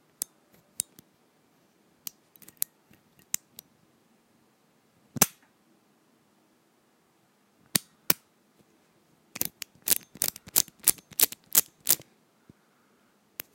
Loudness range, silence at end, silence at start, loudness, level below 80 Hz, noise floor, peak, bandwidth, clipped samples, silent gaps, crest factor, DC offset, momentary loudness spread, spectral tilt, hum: 14 LU; 1.6 s; 5.2 s; -27 LUFS; -72 dBFS; -67 dBFS; 0 dBFS; 17 kHz; under 0.1%; none; 34 dB; under 0.1%; 19 LU; -0.5 dB/octave; none